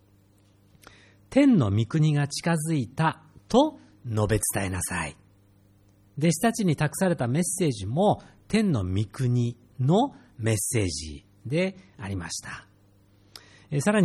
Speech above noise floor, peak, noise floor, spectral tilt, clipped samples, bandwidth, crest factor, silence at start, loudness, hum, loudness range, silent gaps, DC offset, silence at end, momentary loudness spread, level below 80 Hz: 35 dB; -8 dBFS; -59 dBFS; -5.5 dB/octave; under 0.1%; 15 kHz; 18 dB; 1.3 s; -26 LUFS; 50 Hz at -55 dBFS; 4 LU; none; under 0.1%; 0 s; 12 LU; -52 dBFS